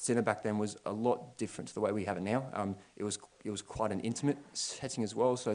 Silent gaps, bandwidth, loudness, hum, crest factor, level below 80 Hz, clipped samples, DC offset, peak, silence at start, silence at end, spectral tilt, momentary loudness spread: none; 10.5 kHz; -36 LUFS; none; 22 dB; -68 dBFS; under 0.1%; under 0.1%; -14 dBFS; 0 s; 0 s; -5 dB/octave; 9 LU